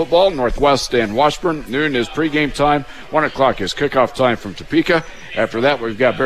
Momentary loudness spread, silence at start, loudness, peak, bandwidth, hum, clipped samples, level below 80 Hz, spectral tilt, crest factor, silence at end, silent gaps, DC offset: 5 LU; 0 s; -17 LUFS; -2 dBFS; 14.5 kHz; none; under 0.1%; -36 dBFS; -5 dB/octave; 14 dB; 0 s; none; 1%